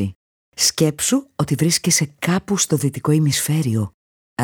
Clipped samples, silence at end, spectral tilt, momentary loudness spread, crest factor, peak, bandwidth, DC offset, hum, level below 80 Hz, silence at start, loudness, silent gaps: under 0.1%; 0 s; -4 dB/octave; 9 LU; 18 dB; -2 dBFS; over 20 kHz; under 0.1%; none; -54 dBFS; 0 s; -18 LUFS; 0.15-0.52 s, 3.94-4.37 s